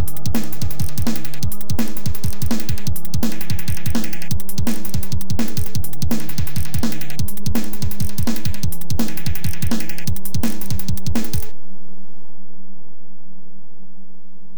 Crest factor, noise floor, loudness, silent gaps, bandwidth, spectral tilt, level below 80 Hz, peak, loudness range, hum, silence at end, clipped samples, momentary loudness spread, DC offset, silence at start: 14 dB; -44 dBFS; -25 LUFS; none; over 20 kHz; -5 dB/octave; -36 dBFS; -4 dBFS; 4 LU; none; 0 s; under 0.1%; 3 LU; 30%; 0 s